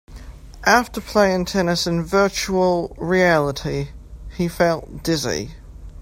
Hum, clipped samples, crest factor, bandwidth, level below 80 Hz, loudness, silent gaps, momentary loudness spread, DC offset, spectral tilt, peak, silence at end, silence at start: none; under 0.1%; 20 dB; 16.5 kHz; -40 dBFS; -20 LUFS; none; 11 LU; under 0.1%; -4.5 dB/octave; 0 dBFS; 0 s; 0.1 s